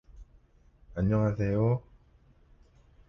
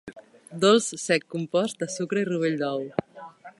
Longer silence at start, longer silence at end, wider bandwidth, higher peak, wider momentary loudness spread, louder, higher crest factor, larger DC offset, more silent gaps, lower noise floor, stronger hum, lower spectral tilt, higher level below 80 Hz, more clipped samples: about the same, 0.15 s vs 0.05 s; first, 1.3 s vs 0.1 s; second, 6.2 kHz vs 11.5 kHz; second, -16 dBFS vs -6 dBFS; second, 7 LU vs 23 LU; second, -29 LUFS vs -25 LUFS; about the same, 16 dB vs 20 dB; neither; neither; first, -61 dBFS vs -45 dBFS; neither; first, -10.5 dB/octave vs -4 dB/octave; first, -48 dBFS vs -70 dBFS; neither